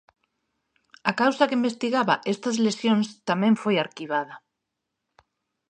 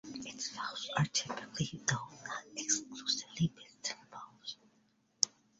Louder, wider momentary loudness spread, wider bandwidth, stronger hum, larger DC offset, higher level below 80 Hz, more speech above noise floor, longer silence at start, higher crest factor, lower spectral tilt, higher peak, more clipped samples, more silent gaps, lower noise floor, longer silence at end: first, -24 LUFS vs -37 LUFS; second, 7 LU vs 13 LU; first, 9.4 kHz vs 7.6 kHz; neither; neither; second, -76 dBFS vs -70 dBFS; first, 59 dB vs 35 dB; first, 1.05 s vs 0.05 s; second, 22 dB vs 34 dB; first, -5 dB/octave vs -3 dB/octave; about the same, -4 dBFS vs -6 dBFS; neither; neither; first, -82 dBFS vs -73 dBFS; first, 1.35 s vs 0.3 s